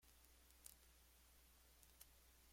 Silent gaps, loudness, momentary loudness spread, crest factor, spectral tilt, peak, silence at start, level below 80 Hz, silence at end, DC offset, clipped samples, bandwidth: none; -66 LUFS; 6 LU; 32 dB; -2 dB/octave; -38 dBFS; 0 s; -74 dBFS; 0 s; under 0.1%; under 0.1%; 16.5 kHz